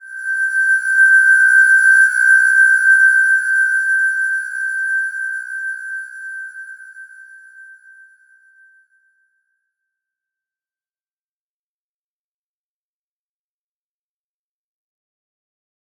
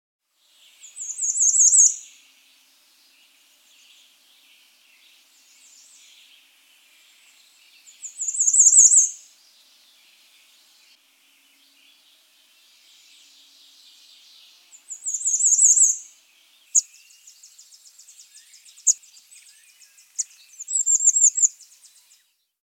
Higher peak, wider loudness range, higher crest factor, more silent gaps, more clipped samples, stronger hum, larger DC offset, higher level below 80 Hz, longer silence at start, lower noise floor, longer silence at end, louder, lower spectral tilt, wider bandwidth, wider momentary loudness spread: about the same, -2 dBFS vs 0 dBFS; first, 20 LU vs 11 LU; second, 16 dB vs 24 dB; neither; neither; neither; neither; about the same, under -90 dBFS vs under -90 dBFS; second, 0.05 s vs 0.95 s; first, under -90 dBFS vs -61 dBFS; first, 8.35 s vs 1.15 s; first, -12 LUFS vs -16 LUFS; about the same, 9 dB/octave vs 8 dB/octave; second, 14.5 kHz vs 17 kHz; second, 19 LU vs 22 LU